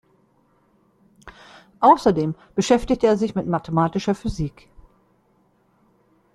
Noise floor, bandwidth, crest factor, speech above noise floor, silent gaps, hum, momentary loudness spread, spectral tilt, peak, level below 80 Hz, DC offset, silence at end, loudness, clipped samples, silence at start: -62 dBFS; 12.5 kHz; 22 dB; 42 dB; none; none; 10 LU; -6.5 dB/octave; -2 dBFS; -44 dBFS; under 0.1%; 1.85 s; -20 LUFS; under 0.1%; 1.25 s